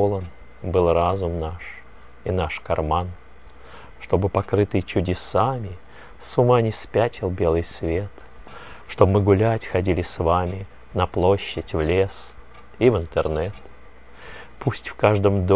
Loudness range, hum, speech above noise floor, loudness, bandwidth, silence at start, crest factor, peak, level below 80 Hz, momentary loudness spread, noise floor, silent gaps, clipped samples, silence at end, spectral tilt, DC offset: 4 LU; none; 26 dB; -22 LUFS; 4 kHz; 0 s; 22 dB; 0 dBFS; -36 dBFS; 18 LU; -47 dBFS; none; under 0.1%; 0 s; -11.5 dB/octave; 0.8%